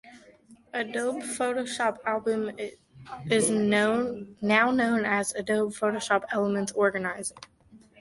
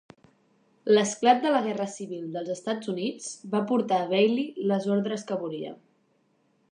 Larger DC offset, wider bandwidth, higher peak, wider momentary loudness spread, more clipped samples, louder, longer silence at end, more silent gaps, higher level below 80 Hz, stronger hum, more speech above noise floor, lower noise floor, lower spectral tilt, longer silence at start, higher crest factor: neither; about the same, 11.5 kHz vs 10.5 kHz; about the same, -8 dBFS vs -6 dBFS; about the same, 11 LU vs 13 LU; neither; about the same, -27 LUFS vs -27 LUFS; second, 0.25 s vs 1 s; neither; first, -66 dBFS vs -80 dBFS; neither; second, 29 dB vs 42 dB; second, -56 dBFS vs -68 dBFS; about the same, -4 dB/octave vs -5 dB/octave; second, 0.05 s vs 0.85 s; about the same, 20 dB vs 22 dB